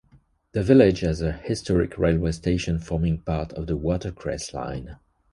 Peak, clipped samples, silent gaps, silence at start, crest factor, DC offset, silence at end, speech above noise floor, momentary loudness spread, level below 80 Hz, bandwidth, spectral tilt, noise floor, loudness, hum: -4 dBFS; under 0.1%; none; 0.55 s; 20 dB; under 0.1%; 0.35 s; 36 dB; 14 LU; -36 dBFS; 11.5 kHz; -7 dB/octave; -59 dBFS; -24 LUFS; none